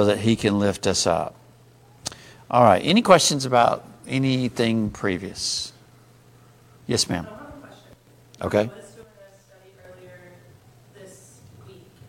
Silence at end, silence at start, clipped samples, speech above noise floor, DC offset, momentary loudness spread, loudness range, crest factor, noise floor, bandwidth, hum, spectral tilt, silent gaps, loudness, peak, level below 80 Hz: 0.4 s; 0 s; under 0.1%; 32 dB; under 0.1%; 19 LU; 12 LU; 24 dB; -52 dBFS; 16.5 kHz; none; -4.5 dB/octave; none; -21 LUFS; 0 dBFS; -54 dBFS